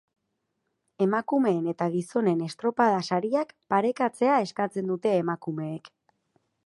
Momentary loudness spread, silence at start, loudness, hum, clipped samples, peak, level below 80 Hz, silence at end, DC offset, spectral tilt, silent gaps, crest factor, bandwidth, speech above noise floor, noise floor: 7 LU; 1 s; -26 LUFS; none; under 0.1%; -8 dBFS; -76 dBFS; 0.8 s; under 0.1%; -7 dB/octave; none; 18 dB; 11.5 kHz; 53 dB; -79 dBFS